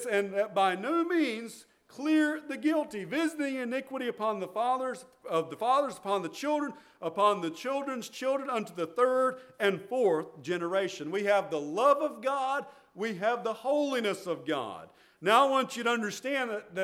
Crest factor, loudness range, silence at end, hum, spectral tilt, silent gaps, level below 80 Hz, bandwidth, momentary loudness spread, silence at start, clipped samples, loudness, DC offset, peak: 22 dB; 2 LU; 0 s; none; -4.5 dB/octave; none; -82 dBFS; 16 kHz; 9 LU; 0 s; under 0.1%; -30 LUFS; under 0.1%; -10 dBFS